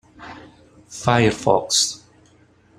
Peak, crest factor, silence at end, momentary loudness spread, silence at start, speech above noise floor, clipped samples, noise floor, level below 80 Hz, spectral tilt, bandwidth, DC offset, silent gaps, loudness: 0 dBFS; 22 dB; 0.8 s; 22 LU; 0.2 s; 36 dB; under 0.1%; -54 dBFS; -52 dBFS; -3.5 dB/octave; 14.5 kHz; under 0.1%; none; -19 LUFS